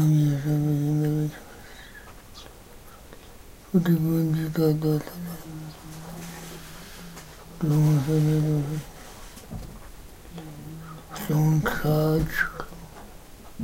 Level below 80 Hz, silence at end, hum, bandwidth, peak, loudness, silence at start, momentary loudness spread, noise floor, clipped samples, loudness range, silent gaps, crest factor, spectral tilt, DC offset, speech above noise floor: -46 dBFS; 0 s; none; 16 kHz; -10 dBFS; -24 LUFS; 0 s; 23 LU; -46 dBFS; under 0.1%; 4 LU; none; 16 dB; -7 dB/octave; under 0.1%; 23 dB